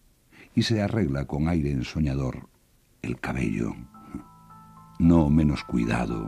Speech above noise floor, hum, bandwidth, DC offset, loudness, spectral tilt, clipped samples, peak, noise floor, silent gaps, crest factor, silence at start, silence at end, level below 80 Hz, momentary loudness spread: 37 dB; none; 13 kHz; under 0.1%; -25 LUFS; -7 dB/octave; under 0.1%; -8 dBFS; -62 dBFS; none; 18 dB; 0.4 s; 0 s; -40 dBFS; 21 LU